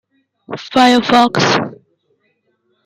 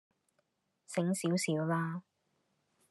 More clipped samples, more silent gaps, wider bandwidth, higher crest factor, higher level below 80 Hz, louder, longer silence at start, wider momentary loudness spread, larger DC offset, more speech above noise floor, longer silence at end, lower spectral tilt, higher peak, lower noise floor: neither; neither; about the same, 12.5 kHz vs 12.5 kHz; about the same, 16 dB vs 18 dB; first, -58 dBFS vs -84 dBFS; first, -12 LUFS vs -34 LUFS; second, 0.5 s vs 0.9 s; first, 18 LU vs 8 LU; neither; first, 52 dB vs 46 dB; first, 1.1 s vs 0.9 s; about the same, -4.5 dB/octave vs -5.5 dB/octave; first, 0 dBFS vs -18 dBFS; second, -64 dBFS vs -80 dBFS